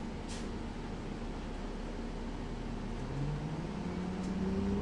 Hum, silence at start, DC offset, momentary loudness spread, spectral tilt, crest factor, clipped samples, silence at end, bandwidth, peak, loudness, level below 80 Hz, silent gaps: none; 0 s; under 0.1%; 7 LU; -7 dB/octave; 14 dB; under 0.1%; 0 s; 11 kHz; -24 dBFS; -40 LUFS; -44 dBFS; none